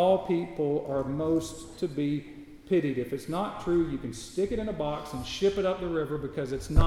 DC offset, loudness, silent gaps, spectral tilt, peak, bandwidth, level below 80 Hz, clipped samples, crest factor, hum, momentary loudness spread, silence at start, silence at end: under 0.1%; -30 LUFS; none; -6.5 dB/octave; -6 dBFS; 14 kHz; -38 dBFS; under 0.1%; 24 dB; none; 8 LU; 0 s; 0 s